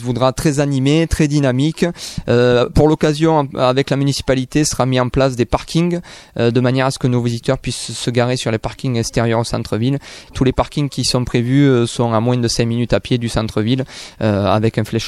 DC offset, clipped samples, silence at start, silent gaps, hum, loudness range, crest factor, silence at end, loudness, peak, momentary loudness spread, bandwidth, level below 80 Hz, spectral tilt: under 0.1%; under 0.1%; 0 s; none; none; 3 LU; 14 dB; 0 s; -16 LUFS; -2 dBFS; 7 LU; 14 kHz; -34 dBFS; -6 dB/octave